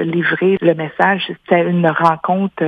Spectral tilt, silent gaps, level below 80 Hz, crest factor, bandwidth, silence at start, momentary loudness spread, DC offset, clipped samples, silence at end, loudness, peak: -8 dB/octave; none; -60 dBFS; 16 dB; 5.8 kHz; 0 s; 4 LU; under 0.1%; under 0.1%; 0 s; -15 LUFS; 0 dBFS